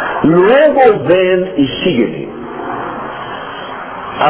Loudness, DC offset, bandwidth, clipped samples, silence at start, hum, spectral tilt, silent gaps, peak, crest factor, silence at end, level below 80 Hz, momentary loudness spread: -11 LUFS; under 0.1%; 4 kHz; under 0.1%; 0 s; none; -10 dB/octave; none; 0 dBFS; 12 dB; 0 s; -46 dBFS; 16 LU